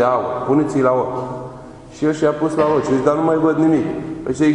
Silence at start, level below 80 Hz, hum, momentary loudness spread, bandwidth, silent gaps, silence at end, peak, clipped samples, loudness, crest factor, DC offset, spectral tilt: 0 s; -48 dBFS; none; 13 LU; 10 kHz; none; 0 s; -2 dBFS; under 0.1%; -17 LUFS; 14 dB; under 0.1%; -7.5 dB/octave